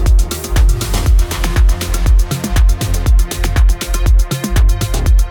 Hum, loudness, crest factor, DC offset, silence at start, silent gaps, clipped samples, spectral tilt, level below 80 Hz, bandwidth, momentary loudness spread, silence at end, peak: none; -15 LUFS; 10 dB; under 0.1%; 0 s; none; under 0.1%; -5 dB/octave; -12 dBFS; 18.5 kHz; 2 LU; 0 s; -2 dBFS